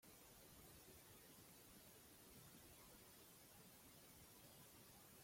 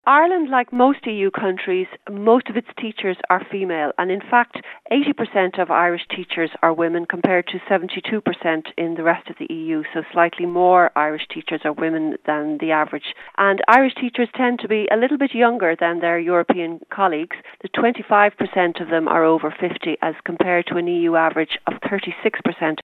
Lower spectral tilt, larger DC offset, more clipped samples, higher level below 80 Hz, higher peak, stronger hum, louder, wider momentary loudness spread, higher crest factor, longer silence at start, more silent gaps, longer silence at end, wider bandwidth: second, -3 dB/octave vs -7.5 dB/octave; neither; neither; second, -80 dBFS vs -74 dBFS; second, -52 dBFS vs 0 dBFS; neither; second, -64 LUFS vs -19 LUFS; second, 1 LU vs 9 LU; second, 14 dB vs 20 dB; about the same, 0 s vs 0.05 s; neither; about the same, 0 s vs 0.05 s; first, 16.5 kHz vs 4.9 kHz